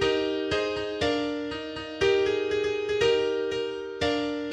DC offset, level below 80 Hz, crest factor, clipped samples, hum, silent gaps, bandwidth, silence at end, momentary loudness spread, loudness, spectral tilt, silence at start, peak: under 0.1%; -52 dBFS; 16 dB; under 0.1%; none; none; 9.8 kHz; 0 s; 9 LU; -27 LUFS; -4.5 dB/octave; 0 s; -12 dBFS